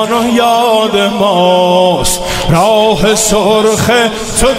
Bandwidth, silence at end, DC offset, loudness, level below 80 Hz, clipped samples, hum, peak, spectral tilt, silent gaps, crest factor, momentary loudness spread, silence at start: 16.5 kHz; 0 s; under 0.1%; -9 LUFS; -28 dBFS; under 0.1%; none; 0 dBFS; -3.5 dB/octave; none; 10 dB; 4 LU; 0 s